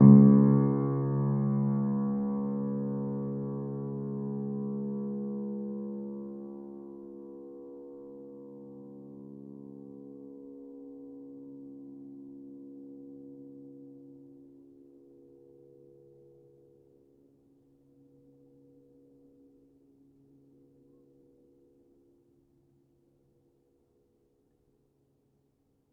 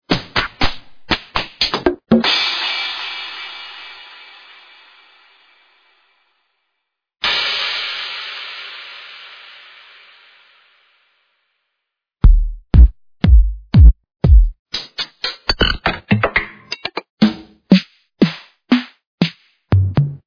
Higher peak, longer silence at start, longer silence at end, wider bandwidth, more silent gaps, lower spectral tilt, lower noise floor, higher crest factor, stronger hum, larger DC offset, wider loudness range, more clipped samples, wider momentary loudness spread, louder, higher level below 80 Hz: second, -6 dBFS vs 0 dBFS; about the same, 0 s vs 0.1 s; first, 12 s vs 0.1 s; second, 2.2 kHz vs 5.4 kHz; second, none vs 14.59-14.65 s, 17.10-17.17 s, 19.07-19.18 s; first, -15 dB/octave vs -6.5 dB/octave; second, -72 dBFS vs -78 dBFS; first, 26 dB vs 18 dB; neither; neither; first, 22 LU vs 16 LU; second, under 0.1% vs 0.2%; about the same, 19 LU vs 21 LU; second, -28 LUFS vs -17 LUFS; second, -68 dBFS vs -20 dBFS